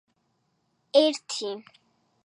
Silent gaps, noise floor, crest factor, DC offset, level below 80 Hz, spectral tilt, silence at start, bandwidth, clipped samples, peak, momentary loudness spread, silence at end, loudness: none; -73 dBFS; 22 dB; under 0.1%; -88 dBFS; -2 dB/octave; 0.95 s; 11 kHz; under 0.1%; -6 dBFS; 14 LU; 0.65 s; -25 LUFS